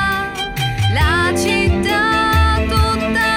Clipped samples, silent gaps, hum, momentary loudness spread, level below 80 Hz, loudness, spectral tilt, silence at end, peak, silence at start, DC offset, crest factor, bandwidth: under 0.1%; none; none; 6 LU; -24 dBFS; -15 LUFS; -5 dB/octave; 0 s; -2 dBFS; 0 s; under 0.1%; 12 dB; 16.5 kHz